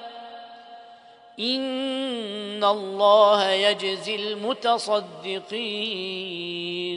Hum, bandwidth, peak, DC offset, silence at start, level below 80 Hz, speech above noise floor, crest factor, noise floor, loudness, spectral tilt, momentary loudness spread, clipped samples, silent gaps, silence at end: none; 10.5 kHz; -6 dBFS; under 0.1%; 0 s; -80 dBFS; 25 dB; 20 dB; -49 dBFS; -24 LUFS; -3.5 dB/octave; 14 LU; under 0.1%; none; 0 s